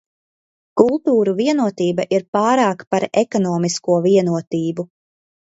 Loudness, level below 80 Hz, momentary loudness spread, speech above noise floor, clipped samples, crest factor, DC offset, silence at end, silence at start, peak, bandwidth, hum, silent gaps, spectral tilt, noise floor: -18 LUFS; -64 dBFS; 8 LU; over 73 dB; under 0.1%; 18 dB; under 0.1%; 0.7 s; 0.75 s; 0 dBFS; 8 kHz; none; 2.28-2.33 s, 2.87-2.91 s, 4.47-4.51 s; -6 dB/octave; under -90 dBFS